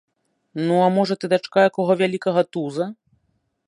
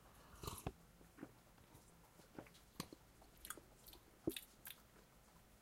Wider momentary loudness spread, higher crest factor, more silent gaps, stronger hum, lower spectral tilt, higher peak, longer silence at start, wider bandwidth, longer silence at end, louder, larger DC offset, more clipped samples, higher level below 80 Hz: second, 10 LU vs 18 LU; second, 18 dB vs 28 dB; neither; neither; first, -6.5 dB/octave vs -4 dB/octave; first, -4 dBFS vs -28 dBFS; first, 0.55 s vs 0 s; second, 11.5 kHz vs 16.5 kHz; first, 0.75 s vs 0 s; first, -20 LUFS vs -55 LUFS; neither; neither; about the same, -72 dBFS vs -68 dBFS